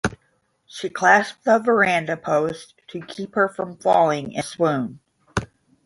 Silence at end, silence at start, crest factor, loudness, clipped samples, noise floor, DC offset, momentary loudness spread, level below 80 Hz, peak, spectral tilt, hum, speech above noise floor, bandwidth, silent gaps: 0.4 s; 0.05 s; 20 dB; -21 LUFS; under 0.1%; -66 dBFS; under 0.1%; 16 LU; -50 dBFS; -2 dBFS; -5 dB/octave; none; 46 dB; 11.5 kHz; none